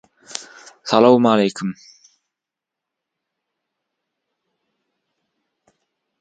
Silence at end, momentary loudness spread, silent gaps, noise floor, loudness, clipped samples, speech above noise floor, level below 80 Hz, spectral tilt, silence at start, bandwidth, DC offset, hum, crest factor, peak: 4.5 s; 20 LU; none; -85 dBFS; -16 LUFS; under 0.1%; 70 dB; -70 dBFS; -5.5 dB/octave; 0.3 s; 9.2 kHz; under 0.1%; none; 22 dB; 0 dBFS